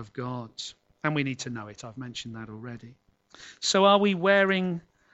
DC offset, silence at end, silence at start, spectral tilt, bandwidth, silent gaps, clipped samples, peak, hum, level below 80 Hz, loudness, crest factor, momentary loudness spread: under 0.1%; 0.35 s; 0 s; -4.5 dB/octave; 8.2 kHz; none; under 0.1%; -6 dBFS; none; -66 dBFS; -25 LUFS; 22 dB; 20 LU